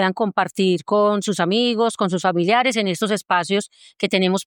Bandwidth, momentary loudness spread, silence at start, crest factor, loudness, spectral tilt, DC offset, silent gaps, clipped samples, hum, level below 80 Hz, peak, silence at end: 18 kHz; 5 LU; 0 s; 14 dB; -19 LUFS; -4.5 dB/octave; under 0.1%; none; under 0.1%; none; -74 dBFS; -4 dBFS; 0.05 s